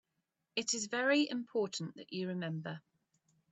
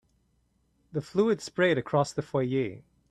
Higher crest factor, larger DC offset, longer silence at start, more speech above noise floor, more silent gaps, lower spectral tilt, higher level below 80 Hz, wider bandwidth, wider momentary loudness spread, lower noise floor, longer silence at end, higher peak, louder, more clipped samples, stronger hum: about the same, 20 dB vs 18 dB; neither; second, 0.55 s vs 0.95 s; first, 49 dB vs 43 dB; neither; second, -3.5 dB/octave vs -6 dB/octave; second, -84 dBFS vs -64 dBFS; second, 8.2 kHz vs 12.5 kHz; about the same, 12 LU vs 10 LU; first, -86 dBFS vs -70 dBFS; first, 0.75 s vs 0.3 s; second, -18 dBFS vs -12 dBFS; second, -36 LUFS vs -28 LUFS; neither; neither